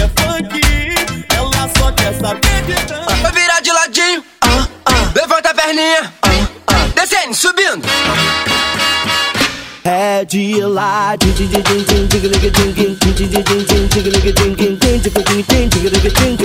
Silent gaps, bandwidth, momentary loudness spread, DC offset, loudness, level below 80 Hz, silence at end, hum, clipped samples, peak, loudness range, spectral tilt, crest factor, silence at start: none; 18 kHz; 4 LU; under 0.1%; -12 LUFS; -20 dBFS; 0 s; none; under 0.1%; 0 dBFS; 2 LU; -3.5 dB/octave; 12 dB; 0 s